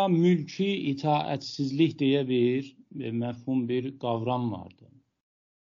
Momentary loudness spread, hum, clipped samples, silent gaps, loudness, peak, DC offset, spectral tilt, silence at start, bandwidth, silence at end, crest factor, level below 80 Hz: 9 LU; none; under 0.1%; none; -28 LUFS; -12 dBFS; under 0.1%; -6 dB/octave; 0 s; 7.4 kHz; 1.05 s; 16 dB; -72 dBFS